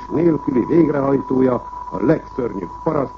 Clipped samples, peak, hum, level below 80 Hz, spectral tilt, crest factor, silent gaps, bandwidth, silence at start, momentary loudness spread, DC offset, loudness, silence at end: under 0.1%; -2 dBFS; none; -44 dBFS; -10 dB/octave; 16 dB; none; 6.6 kHz; 0 s; 9 LU; under 0.1%; -18 LUFS; 0 s